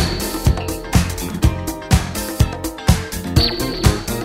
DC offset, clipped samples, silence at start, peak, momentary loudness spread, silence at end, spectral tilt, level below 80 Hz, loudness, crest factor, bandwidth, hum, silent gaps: under 0.1%; under 0.1%; 0 s; 0 dBFS; 4 LU; 0 s; -5 dB/octave; -24 dBFS; -19 LUFS; 18 dB; 16.5 kHz; none; none